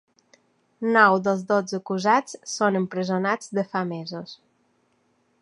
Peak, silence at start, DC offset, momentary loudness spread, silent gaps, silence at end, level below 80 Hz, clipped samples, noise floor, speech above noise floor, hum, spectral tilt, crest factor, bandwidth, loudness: -2 dBFS; 0.8 s; under 0.1%; 15 LU; none; 1.05 s; -74 dBFS; under 0.1%; -67 dBFS; 44 dB; none; -5 dB/octave; 22 dB; 11 kHz; -23 LUFS